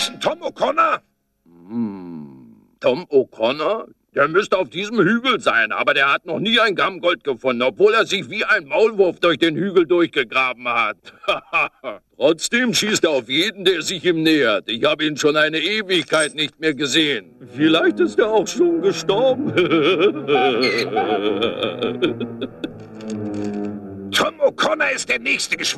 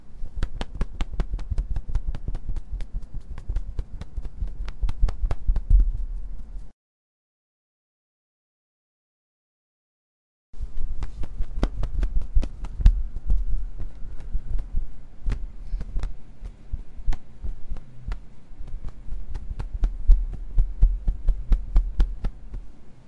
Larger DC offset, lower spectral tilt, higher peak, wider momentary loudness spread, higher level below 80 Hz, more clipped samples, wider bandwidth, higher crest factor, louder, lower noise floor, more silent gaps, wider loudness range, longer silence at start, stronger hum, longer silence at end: neither; second, -3.5 dB/octave vs -7.5 dB/octave; about the same, -4 dBFS vs -4 dBFS; second, 10 LU vs 16 LU; second, -58 dBFS vs -26 dBFS; neither; first, 13.5 kHz vs 5.2 kHz; about the same, 16 dB vs 20 dB; first, -18 LUFS vs -31 LUFS; second, -58 dBFS vs under -90 dBFS; second, none vs 6.73-10.53 s; second, 5 LU vs 11 LU; about the same, 0 s vs 0 s; neither; about the same, 0 s vs 0 s